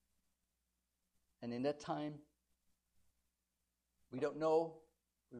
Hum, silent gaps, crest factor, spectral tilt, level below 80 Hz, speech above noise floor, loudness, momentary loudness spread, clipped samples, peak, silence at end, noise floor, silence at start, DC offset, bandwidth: none; none; 20 dB; -6.5 dB/octave; -82 dBFS; 49 dB; -41 LUFS; 16 LU; under 0.1%; -24 dBFS; 0 s; -88 dBFS; 1.4 s; under 0.1%; 9.8 kHz